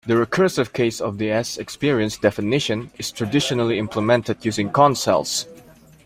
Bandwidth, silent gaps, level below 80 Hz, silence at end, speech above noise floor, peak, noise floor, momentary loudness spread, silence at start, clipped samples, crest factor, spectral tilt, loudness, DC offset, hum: 16 kHz; none; -54 dBFS; 0.45 s; 27 dB; -2 dBFS; -47 dBFS; 9 LU; 0.05 s; under 0.1%; 18 dB; -4.5 dB/octave; -21 LUFS; under 0.1%; none